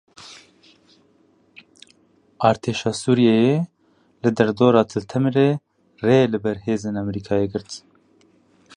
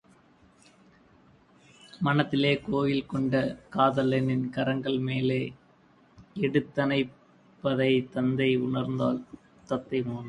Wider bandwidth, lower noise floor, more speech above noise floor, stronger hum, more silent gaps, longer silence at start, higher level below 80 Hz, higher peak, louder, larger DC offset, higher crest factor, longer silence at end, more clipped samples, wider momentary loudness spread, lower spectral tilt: about the same, 10.5 kHz vs 10 kHz; about the same, -59 dBFS vs -60 dBFS; first, 40 dB vs 33 dB; neither; neither; second, 0.2 s vs 1.95 s; first, -56 dBFS vs -62 dBFS; first, -2 dBFS vs -8 dBFS; first, -20 LUFS vs -28 LUFS; neither; about the same, 20 dB vs 22 dB; first, 1 s vs 0 s; neither; first, 15 LU vs 7 LU; second, -6.5 dB/octave vs -8 dB/octave